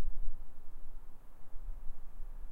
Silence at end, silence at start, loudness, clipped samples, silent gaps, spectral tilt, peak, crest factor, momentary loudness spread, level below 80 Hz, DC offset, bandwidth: 0 s; 0 s; -53 LUFS; under 0.1%; none; -7.5 dB/octave; -18 dBFS; 12 dB; 10 LU; -40 dBFS; under 0.1%; 1.4 kHz